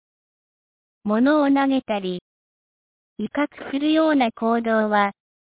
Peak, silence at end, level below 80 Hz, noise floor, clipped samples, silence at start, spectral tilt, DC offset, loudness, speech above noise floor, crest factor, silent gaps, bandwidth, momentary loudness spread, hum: -6 dBFS; 0.45 s; -64 dBFS; under -90 dBFS; under 0.1%; 1.05 s; -9.5 dB/octave; under 0.1%; -21 LUFS; over 70 dB; 16 dB; 2.21-3.16 s; 4 kHz; 11 LU; none